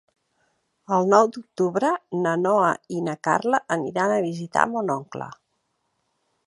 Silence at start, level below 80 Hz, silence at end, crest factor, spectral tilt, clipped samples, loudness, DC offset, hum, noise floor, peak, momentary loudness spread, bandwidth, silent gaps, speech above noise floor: 0.9 s; -70 dBFS; 1.1 s; 22 dB; -6 dB/octave; under 0.1%; -23 LUFS; under 0.1%; none; -74 dBFS; -2 dBFS; 10 LU; 11.5 kHz; none; 51 dB